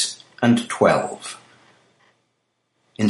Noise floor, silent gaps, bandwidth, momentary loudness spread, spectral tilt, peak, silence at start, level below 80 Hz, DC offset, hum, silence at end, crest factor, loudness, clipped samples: -72 dBFS; none; 11.5 kHz; 17 LU; -4.5 dB/octave; -2 dBFS; 0 s; -64 dBFS; under 0.1%; none; 0 s; 22 dB; -20 LUFS; under 0.1%